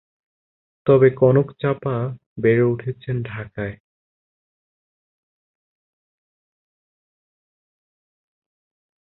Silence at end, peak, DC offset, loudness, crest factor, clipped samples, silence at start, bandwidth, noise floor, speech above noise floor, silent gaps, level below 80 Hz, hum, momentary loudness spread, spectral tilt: 5.3 s; -2 dBFS; under 0.1%; -20 LUFS; 22 dB; under 0.1%; 0.85 s; 4.1 kHz; under -90 dBFS; over 71 dB; 2.26-2.36 s; -56 dBFS; none; 15 LU; -12.5 dB/octave